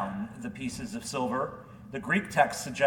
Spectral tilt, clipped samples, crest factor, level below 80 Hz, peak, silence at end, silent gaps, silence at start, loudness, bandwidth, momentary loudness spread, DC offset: -4.5 dB/octave; under 0.1%; 22 dB; -60 dBFS; -8 dBFS; 0 s; none; 0 s; -31 LUFS; 18 kHz; 12 LU; under 0.1%